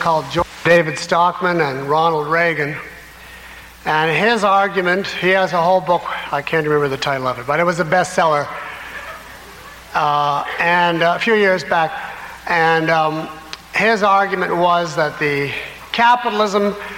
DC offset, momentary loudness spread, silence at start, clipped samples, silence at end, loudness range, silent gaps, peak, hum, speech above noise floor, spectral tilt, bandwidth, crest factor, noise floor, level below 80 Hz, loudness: under 0.1%; 16 LU; 0 s; under 0.1%; 0 s; 3 LU; none; -2 dBFS; none; 21 dB; -4.5 dB/octave; 16.5 kHz; 14 dB; -38 dBFS; -50 dBFS; -16 LUFS